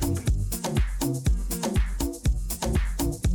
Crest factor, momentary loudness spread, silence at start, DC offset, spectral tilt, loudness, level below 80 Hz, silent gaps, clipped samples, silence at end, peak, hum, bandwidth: 14 dB; 2 LU; 0 s; under 0.1%; -5.5 dB/octave; -28 LUFS; -28 dBFS; none; under 0.1%; 0 s; -12 dBFS; none; 19 kHz